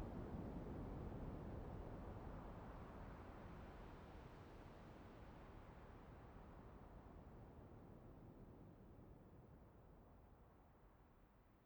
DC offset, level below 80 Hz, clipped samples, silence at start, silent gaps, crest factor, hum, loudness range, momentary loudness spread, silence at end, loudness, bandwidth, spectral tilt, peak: under 0.1%; -62 dBFS; under 0.1%; 0 s; none; 18 dB; none; 10 LU; 13 LU; 0 s; -58 LUFS; over 20 kHz; -8.5 dB/octave; -40 dBFS